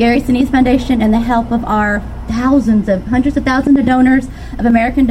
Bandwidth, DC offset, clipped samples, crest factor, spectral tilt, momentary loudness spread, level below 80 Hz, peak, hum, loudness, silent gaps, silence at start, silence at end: 13 kHz; under 0.1%; under 0.1%; 12 dB; -7 dB/octave; 6 LU; -26 dBFS; 0 dBFS; none; -13 LUFS; none; 0 s; 0 s